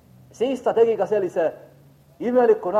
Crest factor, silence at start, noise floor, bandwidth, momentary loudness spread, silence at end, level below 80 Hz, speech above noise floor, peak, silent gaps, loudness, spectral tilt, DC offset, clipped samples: 16 dB; 0.4 s; -52 dBFS; 10 kHz; 9 LU; 0 s; -66 dBFS; 32 dB; -6 dBFS; none; -21 LUFS; -6.5 dB/octave; under 0.1%; under 0.1%